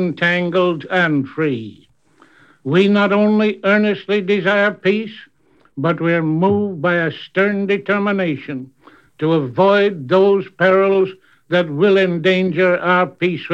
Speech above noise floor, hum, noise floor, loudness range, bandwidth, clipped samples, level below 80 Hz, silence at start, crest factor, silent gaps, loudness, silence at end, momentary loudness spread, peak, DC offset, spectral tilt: 37 dB; none; -53 dBFS; 3 LU; 7.4 kHz; under 0.1%; -66 dBFS; 0 s; 16 dB; none; -16 LUFS; 0 s; 8 LU; -2 dBFS; 0.1%; -7.5 dB/octave